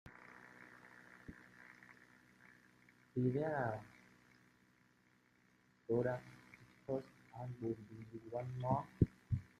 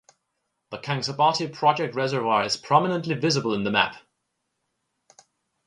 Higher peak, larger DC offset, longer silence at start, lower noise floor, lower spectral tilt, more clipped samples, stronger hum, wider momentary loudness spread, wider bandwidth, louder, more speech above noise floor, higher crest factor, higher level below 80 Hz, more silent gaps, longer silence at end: second, -16 dBFS vs -4 dBFS; neither; second, 0.05 s vs 0.7 s; second, -73 dBFS vs -78 dBFS; first, -9 dB/octave vs -4.5 dB/octave; neither; neither; first, 22 LU vs 7 LU; about the same, 10.5 kHz vs 11 kHz; second, -42 LUFS vs -23 LUFS; second, 33 dB vs 54 dB; first, 28 dB vs 22 dB; about the same, -64 dBFS vs -66 dBFS; neither; second, 0.15 s vs 1.7 s